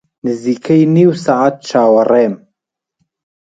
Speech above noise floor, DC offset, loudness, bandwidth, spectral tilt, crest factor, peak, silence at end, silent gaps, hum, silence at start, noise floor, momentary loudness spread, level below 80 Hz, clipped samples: 66 dB; under 0.1%; -12 LUFS; 9 kHz; -7.5 dB/octave; 14 dB; 0 dBFS; 1.1 s; none; none; 0.25 s; -77 dBFS; 9 LU; -60 dBFS; under 0.1%